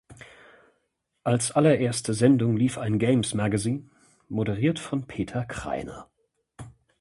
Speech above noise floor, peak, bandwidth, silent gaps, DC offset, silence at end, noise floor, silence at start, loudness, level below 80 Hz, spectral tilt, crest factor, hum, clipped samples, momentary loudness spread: 51 dB; -6 dBFS; 11.5 kHz; none; under 0.1%; 0.3 s; -75 dBFS; 0.1 s; -25 LUFS; -54 dBFS; -6 dB/octave; 20 dB; none; under 0.1%; 13 LU